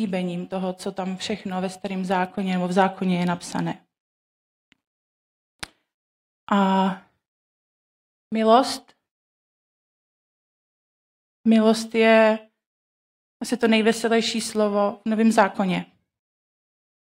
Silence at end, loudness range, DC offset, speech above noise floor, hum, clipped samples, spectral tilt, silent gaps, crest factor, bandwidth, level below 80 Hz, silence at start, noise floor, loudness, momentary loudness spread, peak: 1.3 s; 7 LU; under 0.1%; over 69 dB; none; under 0.1%; -5.5 dB/octave; 4.00-4.72 s, 4.87-5.59 s, 5.94-6.47 s, 7.28-8.31 s, 9.11-11.44 s, 12.66-13.40 s; 22 dB; 16 kHz; -68 dBFS; 0 s; under -90 dBFS; -22 LUFS; 12 LU; -2 dBFS